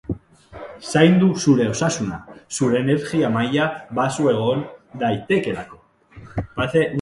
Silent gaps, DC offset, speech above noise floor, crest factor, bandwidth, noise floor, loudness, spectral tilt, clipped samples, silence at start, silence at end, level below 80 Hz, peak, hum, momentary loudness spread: none; under 0.1%; 26 dB; 20 dB; 11.5 kHz; -45 dBFS; -20 LUFS; -5.5 dB/octave; under 0.1%; 0.1 s; 0 s; -48 dBFS; 0 dBFS; none; 16 LU